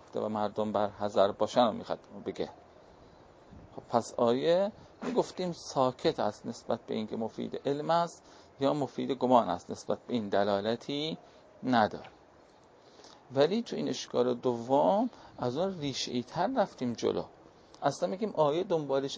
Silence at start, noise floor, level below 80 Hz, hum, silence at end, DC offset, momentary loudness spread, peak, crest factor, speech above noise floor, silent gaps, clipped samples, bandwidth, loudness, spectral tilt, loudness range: 0.15 s; -59 dBFS; -66 dBFS; none; 0 s; under 0.1%; 10 LU; -10 dBFS; 22 dB; 28 dB; none; under 0.1%; 8 kHz; -31 LUFS; -5.5 dB/octave; 3 LU